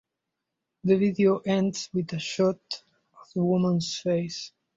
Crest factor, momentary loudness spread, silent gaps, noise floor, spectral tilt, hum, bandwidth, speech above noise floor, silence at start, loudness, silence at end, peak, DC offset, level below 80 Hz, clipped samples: 16 dB; 13 LU; none; -84 dBFS; -6 dB/octave; none; 7.8 kHz; 59 dB; 0.85 s; -26 LUFS; 0.3 s; -10 dBFS; under 0.1%; -66 dBFS; under 0.1%